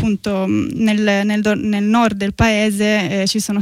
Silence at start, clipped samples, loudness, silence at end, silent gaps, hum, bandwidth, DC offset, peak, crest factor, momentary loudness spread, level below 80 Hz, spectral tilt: 0 s; under 0.1%; -16 LUFS; 0 s; none; none; 15 kHz; under 0.1%; -4 dBFS; 12 dB; 4 LU; -38 dBFS; -5 dB/octave